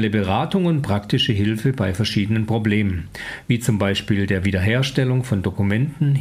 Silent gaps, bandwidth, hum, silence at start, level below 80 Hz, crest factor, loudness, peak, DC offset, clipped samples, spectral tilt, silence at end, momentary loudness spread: none; 15.5 kHz; none; 0 s; -46 dBFS; 14 dB; -20 LUFS; -4 dBFS; under 0.1%; under 0.1%; -6.5 dB/octave; 0 s; 3 LU